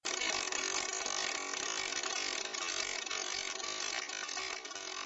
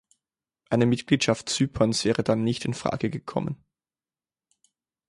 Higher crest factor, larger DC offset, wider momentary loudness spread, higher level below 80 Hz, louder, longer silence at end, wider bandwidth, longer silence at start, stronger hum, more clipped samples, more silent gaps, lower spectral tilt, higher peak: about the same, 18 dB vs 20 dB; neither; second, 4 LU vs 8 LU; second, -70 dBFS vs -54 dBFS; second, -36 LUFS vs -25 LUFS; second, 0 s vs 1.55 s; about the same, 11 kHz vs 11.5 kHz; second, 0.05 s vs 0.7 s; neither; neither; neither; second, 1 dB/octave vs -5 dB/octave; second, -20 dBFS vs -8 dBFS